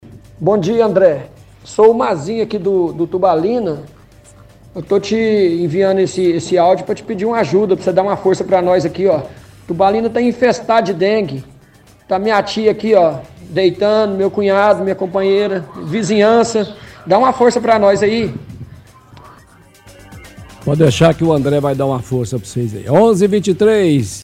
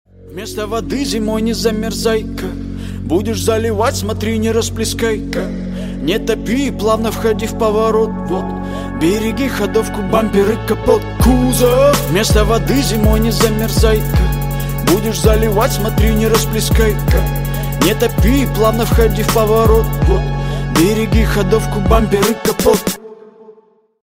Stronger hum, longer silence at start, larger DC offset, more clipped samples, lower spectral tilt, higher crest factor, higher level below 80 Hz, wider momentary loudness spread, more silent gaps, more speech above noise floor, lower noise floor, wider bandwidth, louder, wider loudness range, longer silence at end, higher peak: neither; second, 0.05 s vs 0.2 s; neither; neither; about the same, -6 dB/octave vs -5.5 dB/octave; about the same, 14 dB vs 14 dB; second, -46 dBFS vs -22 dBFS; first, 11 LU vs 8 LU; neither; second, 32 dB vs 36 dB; second, -45 dBFS vs -49 dBFS; second, 14.5 kHz vs 16.5 kHz; about the same, -14 LUFS vs -15 LUFS; about the same, 3 LU vs 4 LU; second, 0 s vs 0.5 s; about the same, 0 dBFS vs 0 dBFS